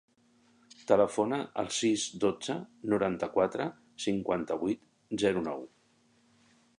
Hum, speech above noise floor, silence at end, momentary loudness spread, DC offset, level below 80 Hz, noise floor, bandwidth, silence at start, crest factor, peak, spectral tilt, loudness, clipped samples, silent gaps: none; 37 dB; 1.1 s; 11 LU; under 0.1%; -66 dBFS; -67 dBFS; 11.5 kHz; 0.9 s; 22 dB; -10 dBFS; -4.5 dB/octave; -31 LUFS; under 0.1%; none